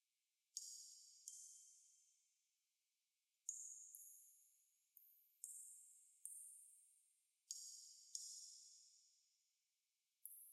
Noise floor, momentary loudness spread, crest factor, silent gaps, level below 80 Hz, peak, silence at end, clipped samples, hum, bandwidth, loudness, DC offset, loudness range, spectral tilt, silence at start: under -90 dBFS; 14 LU; 34 dB; none; under -90 dBFS; -28 dBFS; 0 s; under 0.1%; none; 16 kHz; -57 LUFS; under 0.1%; 3 LU; 6 dB/octave; 0.55 s